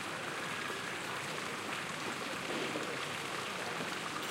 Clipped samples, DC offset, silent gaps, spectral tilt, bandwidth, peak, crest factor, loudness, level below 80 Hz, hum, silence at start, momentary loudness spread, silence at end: under 0.1%; under 0.1%; none; -2.5 dB/octave; 16 kHz; -24 dBFS; 14 dB; -38 LUFS; -76 dBFS; none; 0 s; 2 LU; 0 s